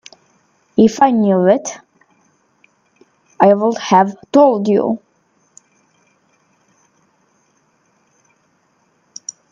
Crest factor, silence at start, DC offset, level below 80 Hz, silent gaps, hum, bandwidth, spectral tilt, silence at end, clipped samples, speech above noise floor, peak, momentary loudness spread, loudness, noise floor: 18 dB; 0.75 s; under 0.1%; -62 dBFS; none; none; 7.6 kHz; -6 dB/octave; 4.55 s; under 0.1%; 47 dB; 0 dBFS; 20 LU; -14 LUFS; -60 dBFS